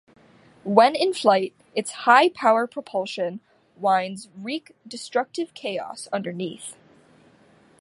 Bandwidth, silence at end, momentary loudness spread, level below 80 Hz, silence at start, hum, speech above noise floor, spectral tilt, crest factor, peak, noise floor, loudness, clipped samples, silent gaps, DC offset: 11.5 kHz; 1.05 s; 18 LU; -76 dBFS; 0.65 s; none; 33 dB; -4 dB/octave; 22 dB; -2 dBFS; -56 dBFS; -23 LUFS; under 0.1%; none; under 0.1%